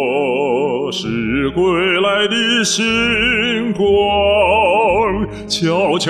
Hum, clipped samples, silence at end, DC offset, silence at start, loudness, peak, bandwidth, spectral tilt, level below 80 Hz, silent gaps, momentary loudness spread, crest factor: none; under 0.1%; 0 s; under 0.1%; 0 s; -15 LUFS; -4 dBFS; 13.5 kHz; -4 dB/octave; -38 dBFS; none; 6 LU; 12 dB